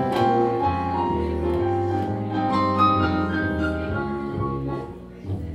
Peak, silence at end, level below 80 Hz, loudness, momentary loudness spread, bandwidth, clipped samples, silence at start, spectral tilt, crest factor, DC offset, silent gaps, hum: -8 dBFS; 0 s; -40 dBFS; -23 LUFS; 11 LU; 12.5 kHz; under 0.1%; 0 s; -8 dB/octave; 16 dB; under 0.1%; none; none